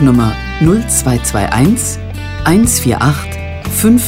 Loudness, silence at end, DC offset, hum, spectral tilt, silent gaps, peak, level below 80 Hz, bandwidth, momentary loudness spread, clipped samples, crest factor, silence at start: -12 LUFS; 0 s; under 0.1%; none; -5 dB/octave; none; 0 dBFS; -26 dBFS; 16.5 kHz; 10 LU; under 0.1%; 12 dB; 0 s